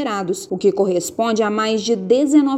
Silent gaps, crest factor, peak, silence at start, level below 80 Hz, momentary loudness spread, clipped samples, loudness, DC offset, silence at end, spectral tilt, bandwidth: none; 14 dB; -4 dBFS; 0 s; -62 dBFS; 7 LU; under 0.1%; -18 LUFS; under 0.1%; 0 s; -5 dB/octave; 15.5 kHz